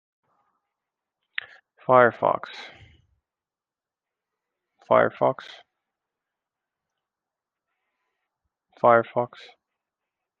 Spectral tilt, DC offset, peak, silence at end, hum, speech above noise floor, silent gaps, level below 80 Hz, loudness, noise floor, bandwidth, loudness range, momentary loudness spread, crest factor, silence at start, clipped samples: -7.5 dB/octave; under 0.1%; -2 dBFS; 1.15 s; none; over 69 dB; none; -74 dBFS; -21 LUFS; under -90 dBFS; 6.8 kHz; 2 LU; 20 LU; 26 dB; 1.9 s; under 0.1%